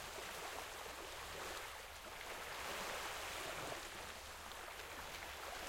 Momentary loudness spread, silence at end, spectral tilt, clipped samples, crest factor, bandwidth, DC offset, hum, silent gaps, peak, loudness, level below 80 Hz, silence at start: 6 LU; 0 s; -1.5 dB/octave; under 0.1%; 18 dB; 16.5 kHz; under 0.1%; none; none; -32 dBFS; -47 LUFS; -64 dBFS; 0 s